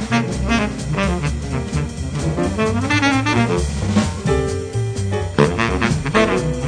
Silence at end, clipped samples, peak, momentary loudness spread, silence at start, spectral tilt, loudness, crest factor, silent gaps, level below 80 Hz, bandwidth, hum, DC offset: 0 s; under 0.1%; -2 dBFS; 7 LU; 0 s; -5.5 dB/octave; -19 LUFS; 18 dB; none; -30 dBFS; 10.5 kHz; none; under 0.1%